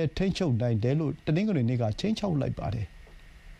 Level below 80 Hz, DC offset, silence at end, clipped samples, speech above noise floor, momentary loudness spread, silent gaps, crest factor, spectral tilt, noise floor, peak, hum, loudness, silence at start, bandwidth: -46 dBFS; under 0.1%; 0.05 s; under 0.1%; 22 dB; 7 LU; none; 14 dB; -7.5 dB/octave; -49 dBFS; -14 dBFS; none; -28 LUFS; 0 s; 10 kHz